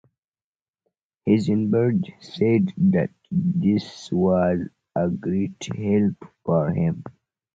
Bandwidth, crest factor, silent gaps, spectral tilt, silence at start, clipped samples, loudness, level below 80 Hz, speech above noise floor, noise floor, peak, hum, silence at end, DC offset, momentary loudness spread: 7.8 kHz; 16 dB; none; -8.5 dB/octave; 1.25 s; under 0.1%; -23 LUFS; -50 dBFS; over 68 dB; under -90 dBFS; -6 dBFS; none; 0.45 s; under 0.1%; 9 LU